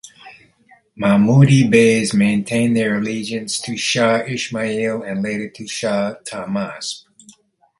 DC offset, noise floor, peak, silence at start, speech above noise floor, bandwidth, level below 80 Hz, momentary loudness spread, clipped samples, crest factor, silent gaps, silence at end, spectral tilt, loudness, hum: under 0.1%; -53 dBFS; 0 dBFS; 0.05 s; 36 dB; 11.5 kHz; -56 dBFS; 14 LU; under 0.1%; 18 dB; none; 0.8 s; -5.5 dB/octave; -17 LUFS; none